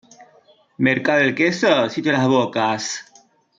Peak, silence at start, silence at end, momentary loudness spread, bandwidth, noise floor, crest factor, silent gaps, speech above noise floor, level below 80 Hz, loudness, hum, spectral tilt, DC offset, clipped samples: -4 dBFS; 0.2 s; 0.55 s; 7 LU; 7.8 kHz; -54 dBFS; 16 dB; none; 36 dB; -64 dBFS; -18 LUFS; none; -4.5 dB/octave; under 0.1%; under 0.1%